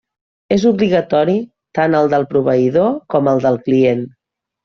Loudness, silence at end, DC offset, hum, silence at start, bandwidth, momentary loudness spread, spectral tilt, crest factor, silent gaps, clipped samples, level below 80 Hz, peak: -15 LUFS; 0.55 s; under 0.1%; none; 0.5 s; 7 kHz; 6 LU; -6 dB/octave; 12 dB; none; under 0.1%; -54 dBFS; -2 dBFS